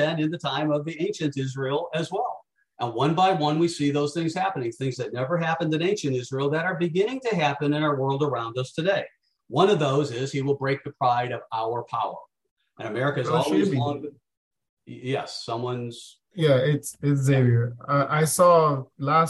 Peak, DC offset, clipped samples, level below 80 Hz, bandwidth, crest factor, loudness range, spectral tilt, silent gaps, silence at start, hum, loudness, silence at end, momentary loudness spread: -6 dBFS; under 0.1%; under 0.1%; -66 dBFS; 12.5 kHz; 18 dB; 4 LU; -6 dB/octave; 12.51-12.56 s, 14.37-14.51 s, 14.69-14.77 s; 0 s; none; -25 LUFS; 0 s; 10 LU